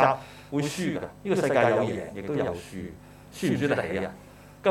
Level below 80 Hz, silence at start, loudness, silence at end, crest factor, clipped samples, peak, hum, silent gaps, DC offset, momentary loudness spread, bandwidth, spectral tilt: -56 dBFS; 0 s; -28 LUFS; 0 s; 22 dB; under 0.1%; -6 dBFS; 50 Hz at -50 dBFS; none; under 0.1%; 17 LU; 17 kHz; -6 dB/octave